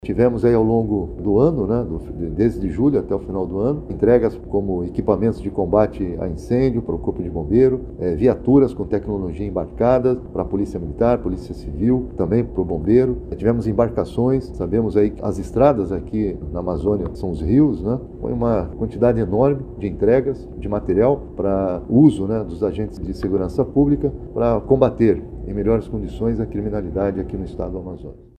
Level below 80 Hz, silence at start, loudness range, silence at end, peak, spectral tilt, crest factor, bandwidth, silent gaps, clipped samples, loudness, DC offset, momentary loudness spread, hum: -34 dBFS; 0.05 s; 2 LU; 0.15 s; 0 dBFS; -10 dB/octave; 18 dB; 9.6 kHz; none; under 0.1%; -20 LUFS; under 0.1%; 10 LU; none